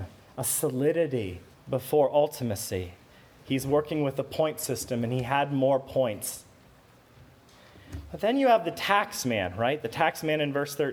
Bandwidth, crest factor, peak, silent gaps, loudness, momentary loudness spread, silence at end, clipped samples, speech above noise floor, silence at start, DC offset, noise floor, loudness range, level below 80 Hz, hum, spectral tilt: over 20 kHz; 22 dB; -6 dBFS; none; -27 LUFS; 11 LU; 0 s; under 0.1%; 29 dB; 0 s; under 0.1%; -56 dBFS; 3 LU; -58 dBFS; none; -4.5 dB/octave